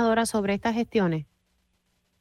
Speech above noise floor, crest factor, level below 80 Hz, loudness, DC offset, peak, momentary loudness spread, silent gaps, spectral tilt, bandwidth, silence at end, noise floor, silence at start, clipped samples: 47 dB; 16 dB; -56 dBFS; -26 LUFS; under 0.1%; -12 dBFS; 4 LU; none; -5.5 dB/octave; 15 kHz; 0.95 s; -72 dBFS; 0 s; under 0.1%